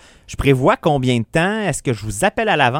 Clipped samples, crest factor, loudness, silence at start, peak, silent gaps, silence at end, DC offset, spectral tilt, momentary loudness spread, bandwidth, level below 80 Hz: under 0.1%; 16 dB; -17 LUFS; 0.3 s; 0 dBFS; none; 0 s; under 0.1%; -5 dB/octave; 7 LU; 16.5 kHz; -38 dBFS